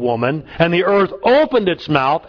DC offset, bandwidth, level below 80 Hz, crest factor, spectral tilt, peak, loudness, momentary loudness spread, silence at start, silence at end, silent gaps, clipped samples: under 0.1%; 5.4 kHz; -48 dBFS; 16 dB; -8 dB/octave; 0 dBFS; -16 LUFS; 5 LU; 0 s; 0.1 s; none; under 0.1%